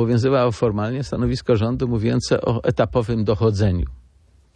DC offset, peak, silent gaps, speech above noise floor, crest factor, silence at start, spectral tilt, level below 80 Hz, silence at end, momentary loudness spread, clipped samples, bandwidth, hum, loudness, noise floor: under 0.1%; -4 dBFS; none; 35 dB; 16 dB; 0 s; -7.5 dB/octave; -36 dBFS; 0.55 s; 5 LU; under 0.1%; 9.6 kHz; none; -20 LUFS; -54 dBFS